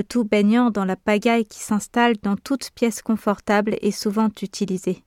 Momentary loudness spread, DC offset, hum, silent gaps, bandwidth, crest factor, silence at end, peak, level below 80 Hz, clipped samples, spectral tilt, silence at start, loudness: 7 LU; under 0.1%; none; none; 15.5 kHz; 16 dB; 0.1 s; -6 dBFS; -56 dBFS; under 0.1%; -5.5 dB/octave; 0 s; -21 LUFS